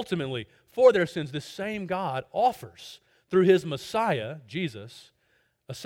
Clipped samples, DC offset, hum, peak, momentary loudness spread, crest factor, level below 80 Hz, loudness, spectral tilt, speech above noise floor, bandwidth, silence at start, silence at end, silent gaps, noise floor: under 0.1%; under 0.1%; none; -6 dBFS; 22 LU; 20 dB; -66 dBFS; -26 LUFS; -6 dB/octave; 43 dB; 16.5 kHz; 0 s; 0 s; none; -70 dBFS